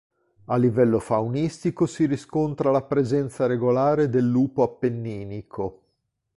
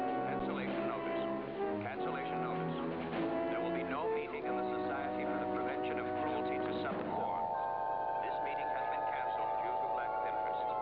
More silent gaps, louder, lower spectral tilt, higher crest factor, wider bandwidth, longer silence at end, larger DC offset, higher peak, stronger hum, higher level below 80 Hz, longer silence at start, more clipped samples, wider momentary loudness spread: neither; first, -23 LUFS vs -37 LUFS; first, -8 dB/octave vs -4.5 dB/octave; about the same, 16 dB vs 12 dB; first, 11.5 kHz vs 5.4 kHz; first, 0.65 s vs 0 s; neither; first, -8 dBFS vs -24 dBFS; neither; first, -56 dBFS vs -64 dBFS; first, 0.5 s vs 0 s; neither; first, 11 LU vs 2 LU